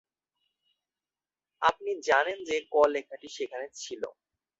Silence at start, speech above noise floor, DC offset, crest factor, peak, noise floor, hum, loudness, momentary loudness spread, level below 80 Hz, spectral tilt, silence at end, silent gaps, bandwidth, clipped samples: 1.6 s; over 61 dB; under 0.1%; 22 dB; -8 dBFS; under -90 dBFS; none; -29 LUFS; 14 LU; -70 dBFS; -2 dB/octave; 0.5 s; none; 8 kHz; under 0.1%